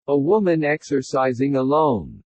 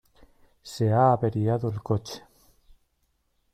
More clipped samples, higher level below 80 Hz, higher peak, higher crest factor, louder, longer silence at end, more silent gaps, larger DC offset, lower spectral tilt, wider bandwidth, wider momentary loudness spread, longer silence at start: neither; about the same, -54 dBFS vs -58 dBFS; about the same, -6 dBFS vs -8 dBFS; second, 14 dB vs 20 dB; first, -20 LUFS vs -25 LUFS; second, 0.15 s vs 1.35 s; neither; neither; about the same, -7 dB/octave vs -7.5 dB/octave; second, 8.6 kHz vs 14 kHz; second, 5 LU vs 20 LU; second, 0.1 s vs 0.65 s